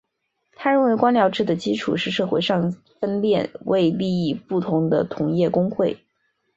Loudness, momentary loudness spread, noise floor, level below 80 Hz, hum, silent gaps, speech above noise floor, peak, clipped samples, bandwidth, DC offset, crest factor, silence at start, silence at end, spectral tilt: -21 LUFS; 7 LU; -74 dBFS; -60 dBFS; none; none; 54 dB; -4 dBFS; under 0.1%; 7.8 kHz; under 0.1%; 18 dB; 0.6 s; 0.6 s; -7 dB/octave